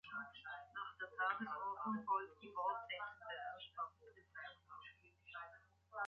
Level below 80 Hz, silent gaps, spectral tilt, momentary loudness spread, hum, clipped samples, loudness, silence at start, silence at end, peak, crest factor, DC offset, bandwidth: -82 dBFS; none; -1.5 dB/octave; 17 LU; none; under 0.1%; -46 LUFS; 0.05 s; 0 s; -28 dBFS; 20 dB; under 0.1%; 7 kHz